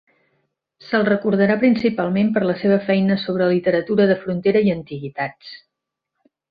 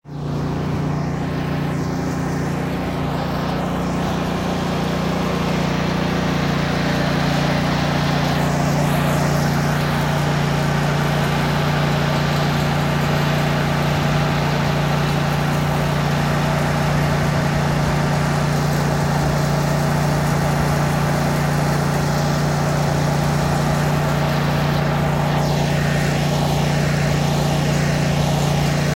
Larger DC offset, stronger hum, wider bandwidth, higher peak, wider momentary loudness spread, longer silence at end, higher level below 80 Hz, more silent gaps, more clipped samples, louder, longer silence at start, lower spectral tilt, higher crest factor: neither; neither; second, 5 kHz vs 16 kHz; about the same, -4 dBFS vs -6 dBFS; first, 10 LU vs 4 LU; first, 0.95 s vs 0 s; second, -58 dBFS vs -34 dBFS; neither; neither; about the same, -19 LUFS vs -19 LUFS; first, 0.85 s vs 0.05 s; first, -9.5 dB/octave vs -6 dB/octave; about the same, 16 dB vs 12 dB